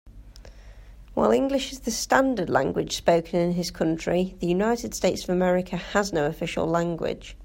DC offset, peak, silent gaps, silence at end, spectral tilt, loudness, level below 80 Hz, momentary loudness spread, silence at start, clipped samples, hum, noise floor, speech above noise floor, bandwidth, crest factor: under 0.1%; -2 dBFS; none; 0 s; -5 dB/octave; -25 LUFS; -46 dBFS; 6 LU; 0.05 s; under 0.1%; none; -45 dBFS; 21 dB; 16.5 kHz; 22 dB